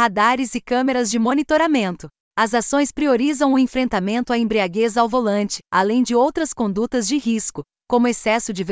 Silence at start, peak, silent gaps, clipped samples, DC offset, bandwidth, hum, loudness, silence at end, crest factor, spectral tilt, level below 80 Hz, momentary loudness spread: 0 s; -4 dBFS; 2.20-2.31 s; under 0.1%; under 0.1%; 8 kHz; none; -19 LUFS; 0 s; 14 dB; -4 dB/octave; -50 dBFS; 5 LU